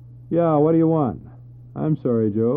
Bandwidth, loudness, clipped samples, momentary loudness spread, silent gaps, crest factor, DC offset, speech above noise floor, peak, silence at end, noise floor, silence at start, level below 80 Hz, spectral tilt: 3.7 kHz; -20 LUFS; under 0.1%; 12 LU; none; 14 dB; under 0.1%; 23 dB; -6 dBFS; 0 s; -42 dBFS; 0.05 s; -54 dBFS; -13.5 dB/octave